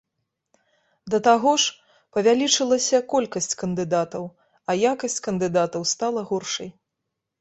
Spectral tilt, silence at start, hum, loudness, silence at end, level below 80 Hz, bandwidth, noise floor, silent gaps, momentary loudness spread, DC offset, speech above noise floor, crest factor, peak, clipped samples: -3 dB/octave; 1.05 s; none; -22 LUFS; 0.7 s; -66 dBFS; 8.2 kHz; -81 dBFS; none; 12 LU; under 0.1%; 59 dB; 20 dB; -4 dBFS; under 0.1%